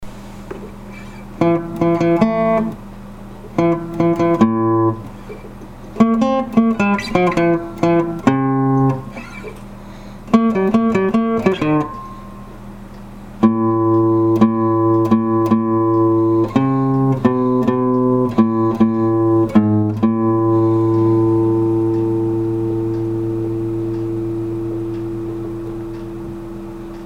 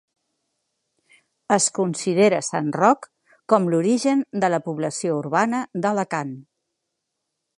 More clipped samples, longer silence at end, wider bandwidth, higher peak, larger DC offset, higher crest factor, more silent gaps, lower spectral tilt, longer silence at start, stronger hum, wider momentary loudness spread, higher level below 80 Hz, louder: neither; second, 0 s vs 1.2 s; second, 7.8 kHz vs 11.5 kHz; about the same, 0 dBFS vs -2 dBFS; neither; second, 16 dB vs 22 dB; neither; first, -9 dB/octave vs -4.5 dB/octave; second, 0 s vs 1.5 s; neither; first, 20 LU vs 7 LU; first, -40 dBFS vs -74 dBFS; first, -16 LUFS vs -21 LUFS